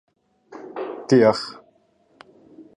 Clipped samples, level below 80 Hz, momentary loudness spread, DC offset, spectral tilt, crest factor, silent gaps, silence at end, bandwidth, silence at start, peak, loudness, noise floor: under 0.1%; -66 dBFS; 20 LU; under 0.1%; -6 dB/octave; 22 dB; none; 0.15 s; 11 kHz; 0.5 s; -4 dBFS; -20 LUFS; -61 dBFS